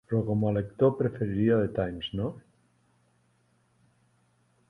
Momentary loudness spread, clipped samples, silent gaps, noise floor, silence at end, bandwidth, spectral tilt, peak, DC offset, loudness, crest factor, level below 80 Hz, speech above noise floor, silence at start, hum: 9 LU; under 0.1%; none; -68 dBFS; 2.3 s; 4 kHz; -9.5 dB/octave; -12 dBFS; under 0.1%; -28 LUFS; 18 dB; -54 dBFS; 41 dB; 0.1 s; none